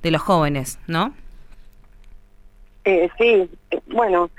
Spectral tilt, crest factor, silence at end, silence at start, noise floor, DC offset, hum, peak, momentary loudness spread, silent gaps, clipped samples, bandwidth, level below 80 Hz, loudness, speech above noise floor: -5.5 dB/octave; 16 dB; 0.1 s; 0 s; -46 dBFS; under 0.1%; none; -6 dBFS; 10 LU; none; under 0.1%; 15.5 kHz; -42 dBFS; -20 LUFS; 28 dB